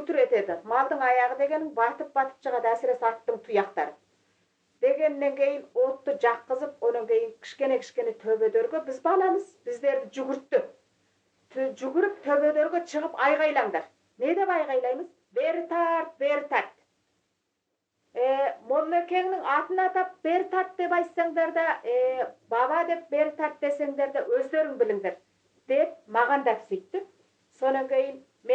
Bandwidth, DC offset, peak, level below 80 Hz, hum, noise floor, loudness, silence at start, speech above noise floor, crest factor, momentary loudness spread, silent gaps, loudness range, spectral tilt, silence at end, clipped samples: 8.2 kHz; under 0.1%; -10 dBFS; -88 dBFS; none; -80 dBFS; -27 LUFS; 0 s; 54 dB; 18 dB; 8 LU; none; 3 LU; -4.5 dB/octave; 0 s; under 0.1%